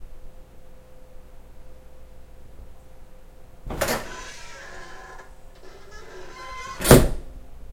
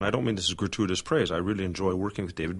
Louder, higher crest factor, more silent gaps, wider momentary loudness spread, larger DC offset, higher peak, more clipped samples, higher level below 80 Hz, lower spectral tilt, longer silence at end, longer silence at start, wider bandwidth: first, -21 LUFS vs -28 LUFS; first, 26 dB vs 18 dB; neither; first, 30 LU vs 4 LU; neither; first, 0 dBFS vs -10 dBFS; neither; first, -36 dBFS vs -50 dBFS; about the same, -5 dB/octave vs -5 dB/octave; about the same, 0 s vs 0 s; about the same, 0 s vs 0 s; first, 16.5 kHz vs 11.5 kHz